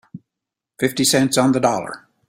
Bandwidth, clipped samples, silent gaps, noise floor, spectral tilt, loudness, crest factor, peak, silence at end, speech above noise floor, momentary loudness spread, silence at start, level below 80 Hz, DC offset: 16 kHz; under 0.1%; none; -84 dBFS; -4 dB/octave; -18 LUFS; 18 dB; -2 dBFS; 0.3 s; 67 dB; 10 LU; 0.15 s; -58 dBFS; under 0.1%